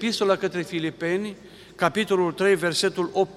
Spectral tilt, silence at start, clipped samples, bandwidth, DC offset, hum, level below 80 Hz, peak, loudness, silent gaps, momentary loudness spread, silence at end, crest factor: -4.5 dB/octave; 0 s; under 0.1%; 14.5 kHz; under 0.1%; none; -64 dBFS; -4 dBFS; -24 LUFS; none; 7 LU; 0 s; 20 dB